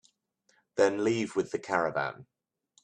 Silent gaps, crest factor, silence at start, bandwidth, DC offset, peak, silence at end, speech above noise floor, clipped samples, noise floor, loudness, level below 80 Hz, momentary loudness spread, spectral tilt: none; 22 dB; 0.75 s; 10.5 kHz; under 0.1%; -10 dBFS; 0.6 s; 43 dB; under 0.1%; -72 dBFS; -30 LUFS; -72 dBFS; 11 LU; -5 dB/octave